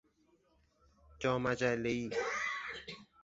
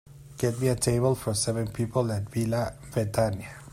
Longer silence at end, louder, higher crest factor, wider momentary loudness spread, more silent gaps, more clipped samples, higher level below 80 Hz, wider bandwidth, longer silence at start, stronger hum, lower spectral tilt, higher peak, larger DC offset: first, 0.2 s vs 0 s; second, -36 LUFS vs -28 LUFS; about the same, 20 dB vs 18 dB; first, 11 LU vs 6 LU; neither; neither; second, -64 dBFS vs -50 dBFS; second, 8 kHz vs 16 kHz; first, 1.1 s vs 0.1 s; neither; second, -4 dB/octave vs -5.5 dB/octave; second, -18 dBFS vs -10 dBFS; neither